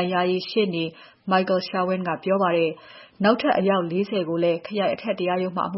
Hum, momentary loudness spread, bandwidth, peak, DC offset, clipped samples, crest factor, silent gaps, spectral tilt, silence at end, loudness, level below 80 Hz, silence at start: none; 5 LU; 5.8 kHz; -6 dBFS; under 0.1%; under 0.1%; 18 dB; none; -9.5 dB/octave; 0 s; -23 LUFS; -68 dBFS; 0 s